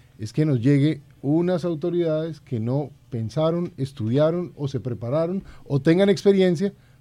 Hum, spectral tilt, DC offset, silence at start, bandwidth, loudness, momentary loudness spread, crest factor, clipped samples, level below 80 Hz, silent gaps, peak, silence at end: none; -8 dB/octave; under 0.1%; 0.2 s; 11 kHz; -23 LUFS; 11 LU; 18 dB; under 0.1%; -56 dBFS; none; -6 dBFS; 0.3 s